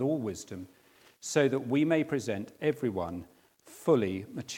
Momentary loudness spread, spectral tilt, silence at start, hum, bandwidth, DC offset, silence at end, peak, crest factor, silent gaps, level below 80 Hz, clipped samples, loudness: 16 LU; -5.5 dB/octave; 0 s; none; 17 kHz; under 0.1%; 0 s; -12 dBFS; 20 dB; none; -72 dBFS; under 0.1%; -30 LUFS